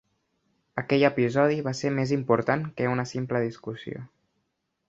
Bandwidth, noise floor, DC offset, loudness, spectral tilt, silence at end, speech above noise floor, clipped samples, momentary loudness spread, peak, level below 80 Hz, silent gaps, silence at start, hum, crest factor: 7.8 kHz; -77 dBFS; under 0.1%; -26 LUFS; -6.5 dB/octave; 0.85 s; 52 dB; under 0.1%; 14 LU; -6 dBFS; -64 dBFS; none; 0.75 s; none; 20 dB